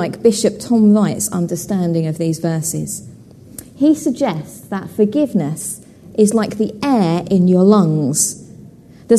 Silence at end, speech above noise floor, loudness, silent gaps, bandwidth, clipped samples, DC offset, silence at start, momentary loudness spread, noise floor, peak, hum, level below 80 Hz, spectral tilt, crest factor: 0 s; 25 dB; -16 LUFS; none; 13.5 kHz; under 0.1%; under 0.1%; 0 s; 15 LU; -40 dBFS; 0 dBFS; none; -54 dBFS; -6 dB/octave; 16 dB